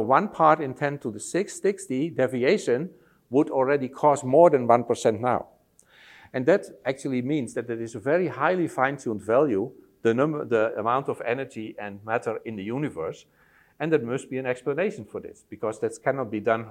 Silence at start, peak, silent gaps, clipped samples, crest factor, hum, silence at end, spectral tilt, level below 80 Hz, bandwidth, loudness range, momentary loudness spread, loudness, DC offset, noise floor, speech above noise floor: 0 s; -4 dBFS; none; under 0.1%; 22 dB; none; 0 s; -6 dB/octave; -70 dBFS; 13.5 kHz; 8 LU; 13 LU; -25 LUFS; under 0.1%; -57 dBFS; 33 dB